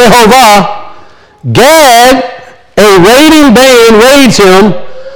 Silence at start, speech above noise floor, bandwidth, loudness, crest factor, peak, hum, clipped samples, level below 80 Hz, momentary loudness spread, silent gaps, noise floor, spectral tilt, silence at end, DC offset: 0 s; 32 dB; over 20 kHz; -2 LUFS; 4 dB; 0 dBFS; none; 20%; -30 dBFS; 13 LU; none; -33 dBFS; -4 dB/octave; 0 s; under 0.1%